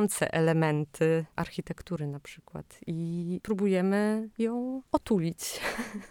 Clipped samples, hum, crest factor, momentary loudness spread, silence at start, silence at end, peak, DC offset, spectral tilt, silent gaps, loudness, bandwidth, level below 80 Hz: under 0.1%; none; 20 dB; 12 LU; 0 s; 0.05 s; -10 dBFS; under 0.1%; -6 dB/octave; none; -30 LUFS; 19 kHz; -58 dBFS